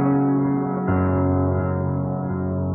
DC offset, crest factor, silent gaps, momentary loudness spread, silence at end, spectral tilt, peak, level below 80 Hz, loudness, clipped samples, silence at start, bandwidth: under 0.1%; 12 dB; none; 5 LU; 0 s; -12 dB/octave; -10 dBFS; -44 dBFS; -22 LUFS; under 0.1%; 0 s; 2.9 kHz